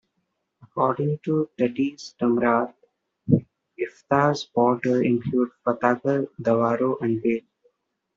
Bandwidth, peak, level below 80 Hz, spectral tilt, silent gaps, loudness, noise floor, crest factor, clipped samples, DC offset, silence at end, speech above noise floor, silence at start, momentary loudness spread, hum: 7.6 kHz; -4 dBFS; -64 dBFS; -6.5 dB/octave; none; -24 LUFS; -76 dBFS; 20 dB; under 0.1%; under 0.1%; 0.75 s; 53 dB; 0.75 s; 8 LU; none